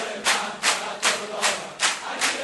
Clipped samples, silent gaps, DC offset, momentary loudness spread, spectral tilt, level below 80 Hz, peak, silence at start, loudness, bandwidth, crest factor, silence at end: under 0.1%; none; under 0.1%; 2 LU; 0.5 dB/octave; -70 dBFS; -6 dBFS; 0 s; -23 LUFS; 12 kHz; 20 dB; 0 s